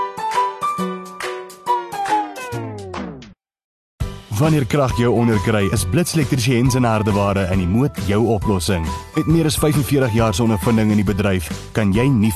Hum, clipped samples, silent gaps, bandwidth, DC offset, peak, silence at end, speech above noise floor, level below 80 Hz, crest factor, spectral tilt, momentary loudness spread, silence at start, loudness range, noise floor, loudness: none; under 0.1%; 3.64-3.98 s; 14 kHz; under 0.1%; -2 dBFS; 0 s; 25 dB; -34 dBFS; 16 dB; -6 dB/octave; 11 LU; 0 s; 7 LU; -42 dBFS; -18 LUFS